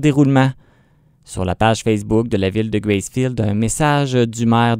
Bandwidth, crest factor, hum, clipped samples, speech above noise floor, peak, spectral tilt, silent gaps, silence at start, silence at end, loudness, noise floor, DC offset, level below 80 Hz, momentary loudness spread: 16 kHz; 16 dB; none; under 0.1%; 38 dB; 0 dBFS; -6 dB/octave; none; 0 s; 0 s; -17 LUFS; -54 dBFS; under 0.1%; -40 dBFS; 6 LU